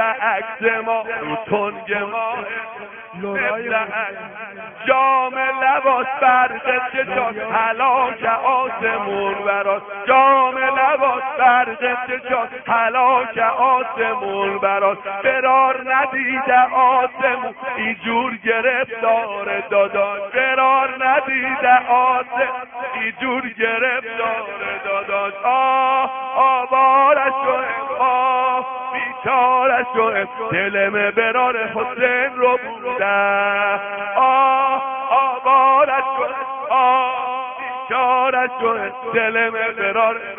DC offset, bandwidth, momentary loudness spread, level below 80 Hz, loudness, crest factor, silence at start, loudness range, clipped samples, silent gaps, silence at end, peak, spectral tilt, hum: under 0.1%; 3.7 kHz; 9 LU; -62 dBFS; -18 LUFS; 16 dB; 0 s; 4 LU; under 0.1%; none; 0 s; -2 dBFS; 3.5 dB/octave; none